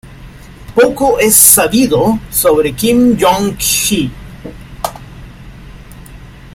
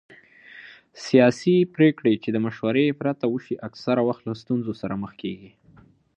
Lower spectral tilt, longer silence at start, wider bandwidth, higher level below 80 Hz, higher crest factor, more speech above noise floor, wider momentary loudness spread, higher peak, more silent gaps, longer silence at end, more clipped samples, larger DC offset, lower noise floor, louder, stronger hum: second, -3 dB/octave vs -7 dB/octave; second, 0.05 s vs 0.55 s; first, 17 kHz vs 8.6 kHz; first, -34 dBFS vs -64 dBFS; second, 12 dB vs 20 dB; second, 23 dB vs 32 dB; about the same, 18 LU vs 16 LU; first, 0 dBFS vs -4 dBFS; neither; second, 0.05 s vs 0.7 s; first, 0.3% vs under 0.1%; neither; second, -33 dBFS vs -54 dBFS; first, -10 LUFS vs -23 LUFS; neither